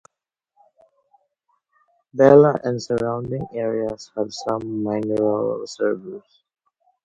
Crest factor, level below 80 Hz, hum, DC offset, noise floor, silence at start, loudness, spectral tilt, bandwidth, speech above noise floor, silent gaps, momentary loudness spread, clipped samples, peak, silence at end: 22 dB; -58 dBFS; none; under 0.1%; -82 dBFS; 2.15 s; -20 LUFS; -7 dB/octave; 7.8 kHz; 62 dB; none; 15 LU; under 0.1%; 0 dBFS; 0.85 s